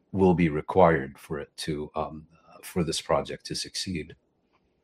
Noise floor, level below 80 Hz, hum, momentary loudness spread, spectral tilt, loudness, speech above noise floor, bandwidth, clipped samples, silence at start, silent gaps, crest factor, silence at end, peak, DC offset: -70 dBFS; -54 dBFS; none; 15 LU; -5.5 dB/octave; -27 LUFS; 43 dB; 16 kHz; under 0.1%; 0.15 s; none; 24 dB; 0.7 s; -4 dBFS; under 0.1%